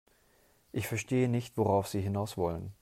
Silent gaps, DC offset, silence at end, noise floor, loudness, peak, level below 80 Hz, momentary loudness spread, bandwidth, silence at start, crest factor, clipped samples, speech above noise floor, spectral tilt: none; under 0.1%; 0.1 s; -67 dBFS; -32 LUFS; -16 dBFS; -62 dBFS; 6 LU; 16 kHz; 0.75 s; 16 dB; under 0.1%; 35 dB; -6.5 dB/octave